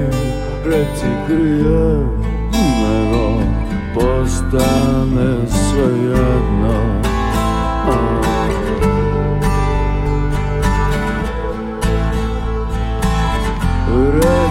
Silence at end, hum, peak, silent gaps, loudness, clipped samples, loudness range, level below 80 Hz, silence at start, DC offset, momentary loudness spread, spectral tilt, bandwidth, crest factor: 0 s; none; -2 dBFS; none; -16 LUFS; under 0.1%; 3 LU; -20 dBFS; 0 s; under 0.1%; 6 LU; -6.5 dB/octave; 15.5 kHz; 14 dB